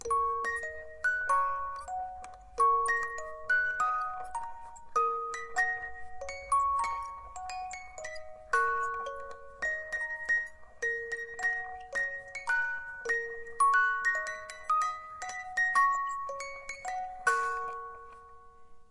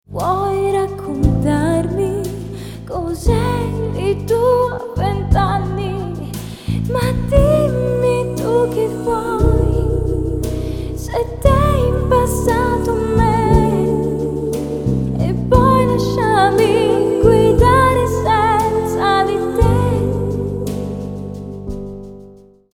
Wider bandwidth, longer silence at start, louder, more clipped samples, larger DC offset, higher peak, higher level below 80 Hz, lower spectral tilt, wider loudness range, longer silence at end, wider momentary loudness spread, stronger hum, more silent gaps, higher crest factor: second, 11.5 kHz vs 18 kHz; about the same, 0 s vs 0.1 s; second, -31 LUFS vs -16 LUFS; neither; neither; second, -14 dBFS vs 0 dBFS; second, -60 dBFS vs -24 dBFS; second, -1 dB/octave vs -7 dB/octave; about the same, 4 LU vs 5 LU; second, 0 s vs 0.4 s; first, 15 LU vs 12 LU; neither; neither; about the same, 20 dB vs 16 dB